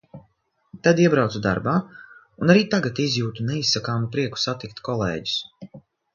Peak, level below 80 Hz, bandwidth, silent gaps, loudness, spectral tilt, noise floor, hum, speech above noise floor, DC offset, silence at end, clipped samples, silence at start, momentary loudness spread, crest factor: -2 dBFS; -54 dBFS; 7.4 kHz; none; -22 LUFS; -5.5 dB/octave; -65 dBFS; none; 43 dB; under 0.1%; 0.35 s; under 0.1%; 0.15 s; 9 LU; 22 dB